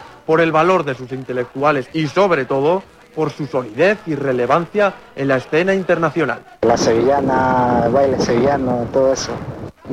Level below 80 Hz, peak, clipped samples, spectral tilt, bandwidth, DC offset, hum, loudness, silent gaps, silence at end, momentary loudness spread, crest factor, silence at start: -46 dBFS; -2 dBFS; under 0.1%; -6 dB/octave; 12 kHz; under 0.1%; none; -17 LUFS; none; 0 s; 9 LU; 16 dB; 0 s